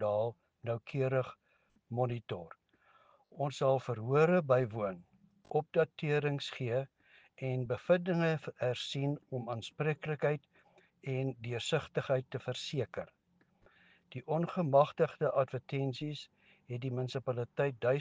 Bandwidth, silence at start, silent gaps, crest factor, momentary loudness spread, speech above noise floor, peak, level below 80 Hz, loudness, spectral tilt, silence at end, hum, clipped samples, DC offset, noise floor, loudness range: 9.4 kHz; 0 s; none; 22 dB; 13 LU; 37 dB; -14 dBFS; -74 dBFS; -35 LUFS; -7 dB/octave; 0 s; none; under 0.1%; under 0.1%; -71 dBFS; 5 LU